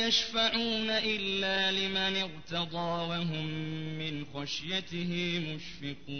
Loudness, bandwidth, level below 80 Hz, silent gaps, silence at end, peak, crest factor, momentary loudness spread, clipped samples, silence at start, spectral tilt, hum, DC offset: -31 LUFS; 6.6 kHz; -60 dBFS; none; 0 s; -14 dBFS; 18 dB; 9 LU; under 0.1%; 0 s; -4 dB/octave; none; 0.4%